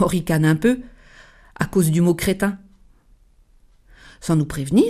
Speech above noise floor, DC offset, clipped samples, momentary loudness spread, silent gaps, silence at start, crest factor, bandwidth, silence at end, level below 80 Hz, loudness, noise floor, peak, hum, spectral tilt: 35 dB; under 0.1%; under 0.1%; 10 LU; none; 0 s; 18 dB; 15 kHz; 0 s; -44 dBFS; -20 LUFS; -53 dBFS; -4 dBFS; none; -6.5 dB/octave